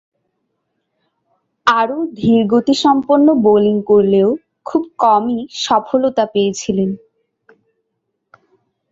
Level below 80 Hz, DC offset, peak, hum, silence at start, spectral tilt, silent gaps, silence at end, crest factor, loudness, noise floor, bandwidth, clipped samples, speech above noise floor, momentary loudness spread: -56 dBFS; under 0.1%; 0 dBFS; none; 1.65 s; -5.5 dB/octave; none; 1.95 s; 16 dB; -14 LUFS; -72 dBFS; 7.8 kHz; under 0.1%; 59 dB; 9 LU